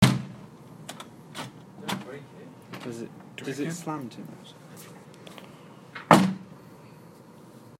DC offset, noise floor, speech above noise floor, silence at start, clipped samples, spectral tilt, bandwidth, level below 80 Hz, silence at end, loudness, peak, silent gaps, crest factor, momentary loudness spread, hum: under 0.1%; -49 dBFS; 13 dB; 0 s; under 0.1%; -5.5 dB/octave; 16 kHz; -62 dBFS; 0.15 s; -28 LUFS; 0 dBFS; none; 30 dB; 26 LU; none